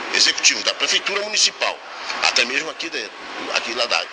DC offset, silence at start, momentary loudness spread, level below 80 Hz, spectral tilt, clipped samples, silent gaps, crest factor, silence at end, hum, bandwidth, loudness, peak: under 0.1%; 0 s; 13 LU; -66 dBFS; 1.5 dB/octave; under 0.1%; none; 20 dB; 0 s; none; 10.5 kHz; -18 LUFS; -2 dBFS